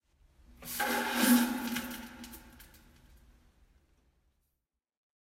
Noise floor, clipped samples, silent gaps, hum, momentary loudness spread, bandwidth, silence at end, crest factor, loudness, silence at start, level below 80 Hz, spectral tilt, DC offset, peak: -86 dBFS; under 0.1%; none; none; 23 LU; 16 kHz; 2.7 s; 24 dB; -30 LUFS; 0.6 s; -62 dBFS; -2.5 dB/octave; under 0.1%; -14 dBFS